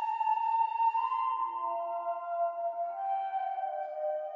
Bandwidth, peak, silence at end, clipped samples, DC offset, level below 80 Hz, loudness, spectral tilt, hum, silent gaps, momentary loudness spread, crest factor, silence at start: 7.2 kHz; -20 dBFS; 0 s; under 0.1%; under 0.1%; under -90 dBFS; -32 LUFS; -2 dB/octave; none; none; 6 LU; 12 dB; 0 s